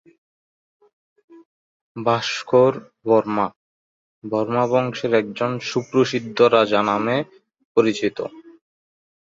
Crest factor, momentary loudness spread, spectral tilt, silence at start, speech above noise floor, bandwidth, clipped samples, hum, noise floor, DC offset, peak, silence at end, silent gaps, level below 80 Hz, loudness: 20 dB; 10 LU; -5.5 dB/octave; 1.35 s; over 71 dB; 7.8 kHz; under 0.1%; none; under -90 dBFS; under 0.1%; -2 dBFS; 0.95 s; 1.45-1.95 s, 3.56-4.22 s, 7.65-7.75 s; -64 dBFS; -20 LUFS